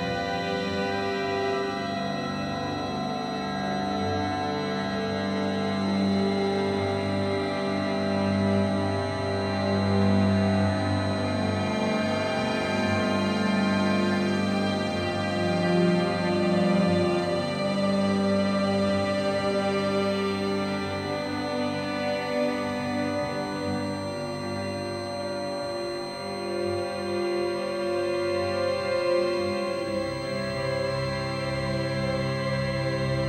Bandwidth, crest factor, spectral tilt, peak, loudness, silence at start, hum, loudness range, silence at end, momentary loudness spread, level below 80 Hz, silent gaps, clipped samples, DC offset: 12.5 kHz; 14 dB; -6 dB/octave; -12 dBFS; -27 LUFS; 0 s; 50 Hz at -55 dBFS; 5 LU; 0 s; 6 LU; -54 dBFS; none; under 0.1%; under 0.1%